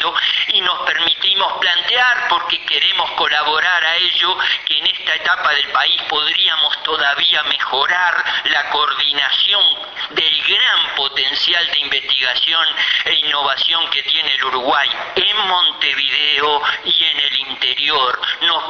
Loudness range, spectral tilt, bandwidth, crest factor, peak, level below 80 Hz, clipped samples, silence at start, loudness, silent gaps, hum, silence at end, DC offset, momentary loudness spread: 1 LU; -0.5 dB/octave; 7 kHz; 14 dB; -2 dBFS; -58 dBFS; under 0.1%; 0 s; -14 LUFS; none; none; 0 s; under 0.1%; 3 LU